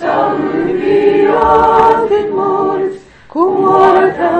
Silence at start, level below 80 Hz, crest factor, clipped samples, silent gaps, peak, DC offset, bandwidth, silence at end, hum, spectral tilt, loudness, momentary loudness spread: 0 s; -40 dBFS; 10 dB; 0.4%; none; 0 dBFS; under 0.1%; 8.6 kHz; 0 s; none; -7 dB/octave; -11 LUFS; 7 LU